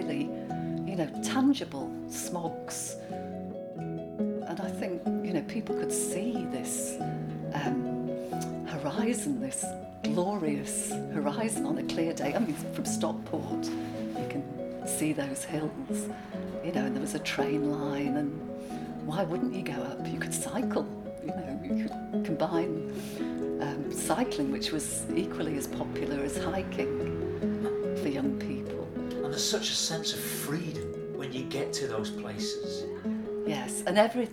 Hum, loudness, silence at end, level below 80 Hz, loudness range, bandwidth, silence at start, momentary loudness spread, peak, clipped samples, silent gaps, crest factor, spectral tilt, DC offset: none; -32 LUFS; 0 s; -58 dBFS; 3 LU; 18.5 kHz; 0 s; 7 LU; -10 dBFS; under 0.1%; none; 22 dB; -4.5 dB/octave; under 0.1%